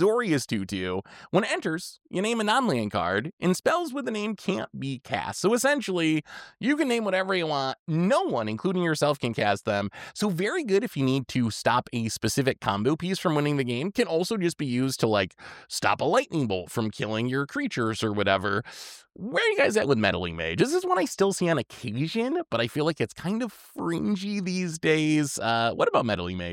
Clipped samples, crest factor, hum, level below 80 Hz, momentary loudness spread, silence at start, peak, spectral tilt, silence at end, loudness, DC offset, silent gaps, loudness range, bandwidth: under 0.1%; 20 dB; none; -62 dBFS; 7 LU; 0 s; -6 dBFS; -5 dB/octave; 0 s; -26 LUFS; under 0.1%; 3.33-3.38 s, 7.79-7.86 s; 2 LU; 17 kHz